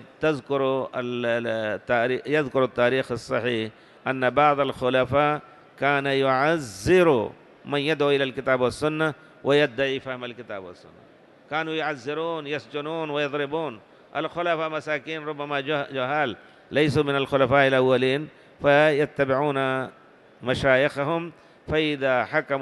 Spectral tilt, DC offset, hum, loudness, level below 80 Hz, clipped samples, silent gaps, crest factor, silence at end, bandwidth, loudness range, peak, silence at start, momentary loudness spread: -6 dB/octave; under 0.1%; none; -24 LUFS; -54 dBFS; under 0.1%; none; 18 dB; 0 s; 12.5 kHz; 7 LU; -6 dBFS; 0 s; 11 LU